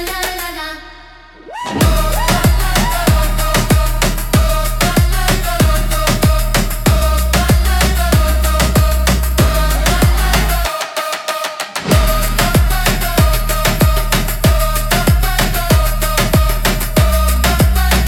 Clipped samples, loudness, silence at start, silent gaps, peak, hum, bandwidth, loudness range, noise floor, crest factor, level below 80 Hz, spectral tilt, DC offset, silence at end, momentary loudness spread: under 0.1%; -14 LUFS; 0 s; none; 0 dBFS; none; 17.5 kHz; 2 LU; -38 dBFS; 12 dB; -16 dBFS; -4.5 dB/octave; under 0.1%; 0 s; 6 LU